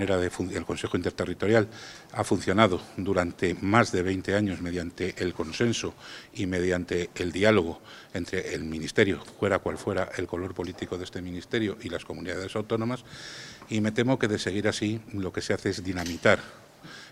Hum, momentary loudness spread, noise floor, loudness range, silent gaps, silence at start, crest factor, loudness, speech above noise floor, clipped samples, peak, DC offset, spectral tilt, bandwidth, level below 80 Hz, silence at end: none; 13 LU; -47 dBFS; 6 LU; none; 0 s; 26 dB; -28 LUFS; 19 dB; under 0.1%; -2 dBFS; under 0.1%; -5.5 dB/octave; 15.5 kHz; -58 dBFS; 0 s